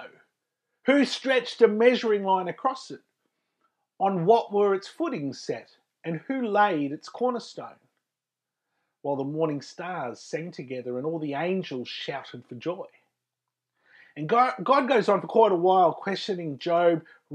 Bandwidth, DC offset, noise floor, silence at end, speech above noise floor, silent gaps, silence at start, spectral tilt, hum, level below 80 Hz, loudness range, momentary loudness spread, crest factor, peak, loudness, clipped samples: 10.5 kHz; under 0.1%; -88 dBFS; 0 s; 63 dB; none; 0 s; -6 dB/octave; none; -88 dBFS; 9 LU; 16 LU; 20 dB; -6 dBFS; -26 LUFS; under 0.1%